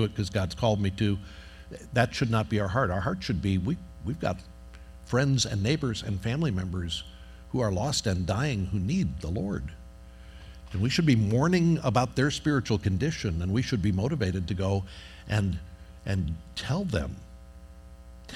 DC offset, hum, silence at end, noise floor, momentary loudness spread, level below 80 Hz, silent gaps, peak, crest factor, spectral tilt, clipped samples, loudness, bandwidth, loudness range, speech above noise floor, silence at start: under 0.1%; none; 0 s; -47 dBFS; 21 LU; -46 dBFS; none; -8 dBFS; 20 dB; -6 dB/octave; under 0.1%; -28 LUFS; 13 kHz; 5 LU; 20 dB; 0 s